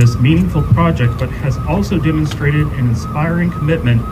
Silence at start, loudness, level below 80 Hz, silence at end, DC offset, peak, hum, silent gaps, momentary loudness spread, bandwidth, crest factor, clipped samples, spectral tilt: 0 s; -15 LUFS; -26 dBFS; 0 s; under 0.1%; 0 dBFS; none; none; 5 LU; 14 kHz; 12 dB; under 0.1%; -7.5 dB/octave